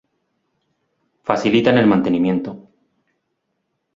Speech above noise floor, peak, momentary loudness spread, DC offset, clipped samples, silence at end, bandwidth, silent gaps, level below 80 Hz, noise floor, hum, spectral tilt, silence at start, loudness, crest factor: 57 dB; 0 dBFS; 13 LU; under 0.1%; under 0.1%; 1.35 s; 7.6 kHz; none; -56 dBFS; -73 dBFS; none; -7 dB/octave; 1.25 s; -17 LUFS; 20 dB